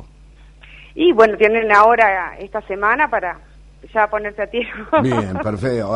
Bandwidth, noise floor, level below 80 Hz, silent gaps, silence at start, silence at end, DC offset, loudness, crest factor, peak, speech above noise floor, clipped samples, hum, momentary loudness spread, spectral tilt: 10.5 kHz; -44 dBFS; -44 dBFS; none; 0 s; 0 s; under 0.1%; -16 LUFS; 18 dB; 0 dBFS; 27 dB; under 0.1%; none; 14 LU; -6.5 dB/octave